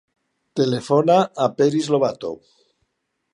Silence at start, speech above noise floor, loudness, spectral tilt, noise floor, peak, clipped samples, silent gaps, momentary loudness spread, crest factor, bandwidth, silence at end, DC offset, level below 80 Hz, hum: 0.55 s; 55 dB; -19 LUFS; -6.5 dB/octave; -74 dBFS; -2 dBFS; under 0.1%; none; 15 LU; 18 dB; 11 kHz; 1 s; under 0.1%; -66 dBFS; none